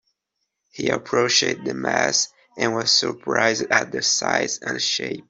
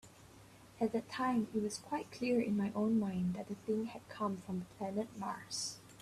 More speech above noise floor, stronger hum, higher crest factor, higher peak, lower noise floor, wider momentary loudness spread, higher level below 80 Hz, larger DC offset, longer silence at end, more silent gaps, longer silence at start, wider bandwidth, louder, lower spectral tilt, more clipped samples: first, 56 dB vs 22 dB; neither; about the same, 20 dB vs 16 dB; first, -2 dBFS vs -22 dBFS; first, -78 dBFS vs -59 dBFS; about the same, 7 LU vs 8 LU; first, -64 dBFS vs -70 dBFS; neither; about the same, 0.1 s vs 0 s; neither; first, 0.75 s vs 0.05 s; second, 8.2 kHz vs 14 kHz; first, -20 LUFS vs -38 LUFS; second, -1.5 dB/octave vs -5.5 dB/octave; neither